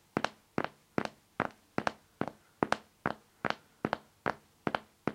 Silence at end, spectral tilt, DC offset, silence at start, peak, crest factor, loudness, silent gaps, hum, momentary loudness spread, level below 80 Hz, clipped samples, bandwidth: 0 s; -5.5 dB/octave; under 0.1%; 0.15 s; -6 dBFS; 32 dB; -38 LUFS; none; none; 6 LU; -68 dBFS; under 0.1%; 16.5 kHz